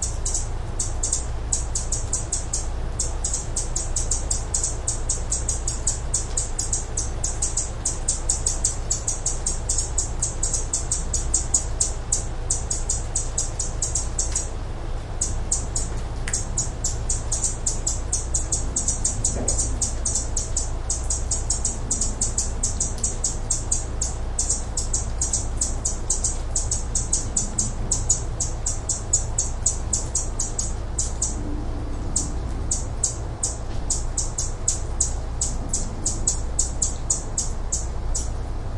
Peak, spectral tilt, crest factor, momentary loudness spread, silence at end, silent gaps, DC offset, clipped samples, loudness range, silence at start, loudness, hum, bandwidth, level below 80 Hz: -4 dBFS; -2.5 dB/octave; 20 dB; 5 LU; 0 s; none; under 0.1%; under 0.1%; 3 LU; 0 s; -24 LUFS; none; 11.5 kHz; -28 dBFS